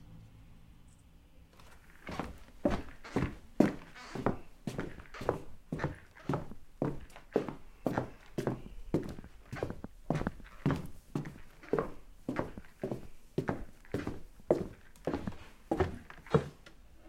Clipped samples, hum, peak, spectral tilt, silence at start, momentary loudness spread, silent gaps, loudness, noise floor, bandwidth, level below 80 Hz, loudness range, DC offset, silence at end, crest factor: under 0.1%; none; -10 dBFS; -7.5 dB/octave; 0 s; 16 LU; none; -38 LUFS; -58 dBFS; 16.5 kHz; -52 dBFS; 4 LU; under 0.1%; 0 s; 28 dB